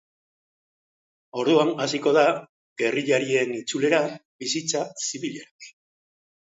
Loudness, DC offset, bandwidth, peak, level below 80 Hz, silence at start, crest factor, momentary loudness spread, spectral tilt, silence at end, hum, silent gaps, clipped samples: -24 LUFS; under 0.1%; 8 kHz; -6 dBFS; -76 dBFS; 1.35 s; 20 dB; 13 LU; -3.5 dB/octave; 0.8 s; none; 2.49-2.76 s, 4.25-4.39 s, 5.51-5.59 s; under 0.1%